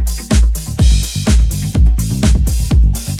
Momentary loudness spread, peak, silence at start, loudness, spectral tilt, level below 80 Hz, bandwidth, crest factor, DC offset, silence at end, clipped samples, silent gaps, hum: 2 LU; 0 dBFS; 0 s; -14 LUFS; -5.5 dB/octave; -12 dBFS; 15.5 kHz; 10 dB; under 0.1%; 0 s; under 0.1%; none; none